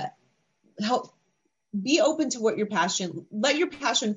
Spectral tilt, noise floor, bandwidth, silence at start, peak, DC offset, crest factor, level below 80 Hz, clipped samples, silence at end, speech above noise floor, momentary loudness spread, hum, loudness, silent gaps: -3 dB/octave; -75 dBFS; 9 kHz; 0 s; -10 dBFS; under 0.1%; 18 dB; -74 dBFS; under 0.1%; 0 s; 49 dB; 10 LU; none; -26 LUFS; none